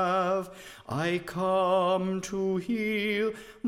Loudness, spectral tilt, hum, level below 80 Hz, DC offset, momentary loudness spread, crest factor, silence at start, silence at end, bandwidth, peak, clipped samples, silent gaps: -28 LUFS; -5.5 dB/octave; none; -62 dBFS; under 0.1%; 8 LU; 14 dB; 0 s; 0 s; 15.5 kHz; -14 dBFS; under 0.1%; none